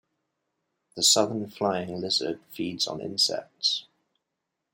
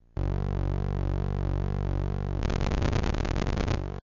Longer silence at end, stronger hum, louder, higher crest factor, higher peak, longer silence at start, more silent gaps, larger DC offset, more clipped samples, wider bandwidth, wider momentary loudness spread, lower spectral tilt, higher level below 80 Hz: first, 0.9 s vs 0 s; neither; first, -26 LUFS vs -30 LUFS; first, 22 dB vs 14 dB; first, -8 dBFS vs -14 dBFS; first, 0.95 s vs 0.15 s; neither; neither; neither; first, 16.5 kHz vs 7.4 kHz; first, 13 LU vs 3 LU; second, -2 dB/octave vs -7 dB/octave; second, -74 dBFS vs -32 dBFS